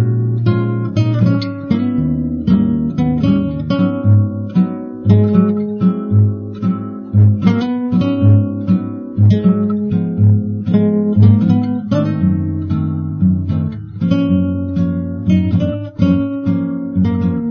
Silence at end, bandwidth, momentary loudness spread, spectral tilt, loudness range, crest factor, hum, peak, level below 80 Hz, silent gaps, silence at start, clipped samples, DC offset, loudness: 0 s; 5.4 kHz; 7 LU; -10.5 dB/octave; 3 LU; 14 dB; none; 0 dBFS; -40 dBFS; none; 0 s; under 0.1%; under 0.1%; -15 LUFS